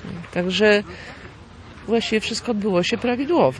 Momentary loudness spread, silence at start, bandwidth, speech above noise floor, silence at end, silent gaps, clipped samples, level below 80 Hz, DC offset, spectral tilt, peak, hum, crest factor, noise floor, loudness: 21 LU; 0 s; 11 kHz; 21 dB; 0 s; none; under 0.1%; -50 dBFS; under 0.1%; -5 dB/octave; -4 dBFS; none; 18 dB; -42 dBFS; -21 LUFS